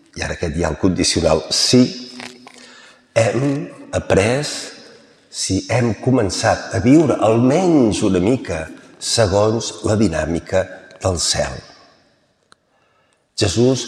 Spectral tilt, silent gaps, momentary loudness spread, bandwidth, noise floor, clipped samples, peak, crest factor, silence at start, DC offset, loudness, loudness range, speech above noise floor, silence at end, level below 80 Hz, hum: -4.5 dB/octave; none; 13 LU; 13.5 kHz; -60 dBFS; under 0.1%; -2 dBFS; 16 dB; 0.15 s; under 0.1%; -17 LUFS; 6 LU; 44 dB; 0 s; -40 dBFS; none